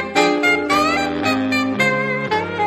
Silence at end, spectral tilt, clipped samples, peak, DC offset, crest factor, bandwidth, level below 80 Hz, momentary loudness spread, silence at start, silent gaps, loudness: 0 s; -4.5 dB/octave; under 0.1%; -2 dBFS; under 0.1%; 16 dB; 15.5 kHz; -50 dBFS; 5 LU; 0 s; none; -17 LUFS